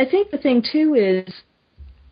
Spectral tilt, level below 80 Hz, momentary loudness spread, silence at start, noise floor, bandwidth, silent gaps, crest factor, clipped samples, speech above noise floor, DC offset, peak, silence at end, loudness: -10.5 dB/octave; -50 dBFS; 6 LU; 0 s; -45 dBFS; 5.2 kHz; none; 14 dB; under 0.1%; 27 dB; under 0.1%; -6 dBFS; 0.25 s; -18 LUFS